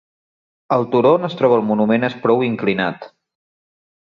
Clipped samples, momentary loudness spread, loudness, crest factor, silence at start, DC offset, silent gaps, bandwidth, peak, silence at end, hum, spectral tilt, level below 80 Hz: under 0.1%; 6 LU; -17 LUFS; 16 dB; 0.7 s; under 0.1%; none; 6.8 kHz; -2 dBFS; 0.95 s; none; -8.5 dB/octave; -62 dBFS